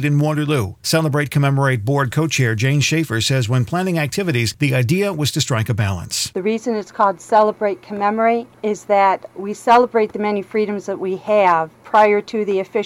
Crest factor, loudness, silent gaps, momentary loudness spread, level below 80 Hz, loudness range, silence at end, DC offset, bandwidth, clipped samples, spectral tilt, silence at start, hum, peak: 16 dB; -18 LUFS; none; 7 LU; -54 dBFS; 2 LU; 0 s; under 0.1%; 17.5 kHz; under 0.1%; -5.5 dB/octave; 0 s; none; -2 dBFS